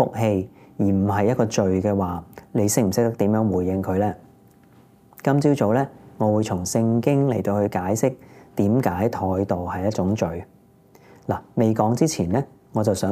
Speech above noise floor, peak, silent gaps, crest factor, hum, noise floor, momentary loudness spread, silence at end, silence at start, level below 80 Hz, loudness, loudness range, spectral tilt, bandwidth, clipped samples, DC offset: 32 dB; -4 dBFS; none; 18 dB; none; -53 dBFS; 9 LU; 0 s; 0 s; -58 dBFS; -22 LUFS; 3 LU; -6.5 dB/octave; 16 kHz; under 0.1%; under 0.1%